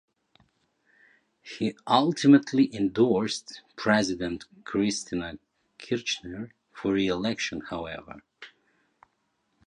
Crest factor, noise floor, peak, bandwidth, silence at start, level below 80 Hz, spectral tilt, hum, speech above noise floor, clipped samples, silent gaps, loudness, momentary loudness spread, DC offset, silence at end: 22 dB; -74 dBFS; -6 dBFS; 10 kHz; 1.45 s; -60 dBFS; -5 dB/octave; none; 48 dB; under 0.1%; none; -26 LUFS; 21 LU; under 0.1%; 1.2 s